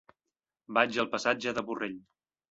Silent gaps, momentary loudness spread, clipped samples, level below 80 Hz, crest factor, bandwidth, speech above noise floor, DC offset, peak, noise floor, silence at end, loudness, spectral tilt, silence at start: none; 10 LU; under 0.1%; -70 dBFS; 26 dB; 8 kHz; 59 dB; under 0.1%; -8 dBFS; -89 dBFS; 0.5 s; -30 LUFS; -3.5 dB/octave; 0.7 s